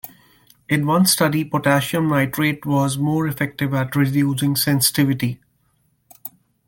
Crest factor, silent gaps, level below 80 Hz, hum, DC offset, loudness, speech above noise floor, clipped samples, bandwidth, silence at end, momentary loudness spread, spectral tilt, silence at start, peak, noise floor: 18 dB; none; -56 dBFS; none; under 0.1%; -19 LUFS; 45 dB; under 0.1%; 17 kHz; 0.4 s; 17 LU; -4.5 dB/octave; 0.05 s; -2 dBFS; -64 dBFS